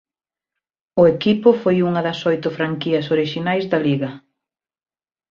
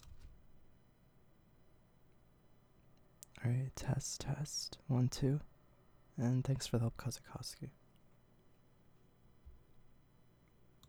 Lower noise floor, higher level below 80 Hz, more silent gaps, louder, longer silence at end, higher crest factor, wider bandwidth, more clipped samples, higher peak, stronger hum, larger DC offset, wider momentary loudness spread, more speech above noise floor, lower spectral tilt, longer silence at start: first, -90 dBFS vs -68 dBFS; about the same, -58 dBFS vs -60 dBFS; neither; first, -18 LUFS vs -39 LUFS; first, 1.15 s vs 1 s; about the same, 18 dB vs 22 dB; second, 7 kHz vs 16.5 kHz; neither; first, -2 dBFS vs -22 dBFS; neither; neither; second, 8 LU vs 17 LU; first, 72 dB vs 29 dB; first, -7.5 dB/octave vs -5.5 dB/octave; first, 0.95 s vs 0 s